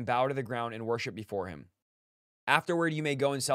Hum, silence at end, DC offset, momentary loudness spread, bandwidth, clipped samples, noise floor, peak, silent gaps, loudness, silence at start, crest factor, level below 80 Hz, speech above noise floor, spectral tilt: none; 0 s; under 0.1%; 11 LU; 16 kHz; under 0.1%; under -90 dBFS; -6 dBFS; 1.82-2.47 s; -31 LUFS; 0 s; 26 dB; -70 dBFS; over 59 dB; -4.5 dB/octave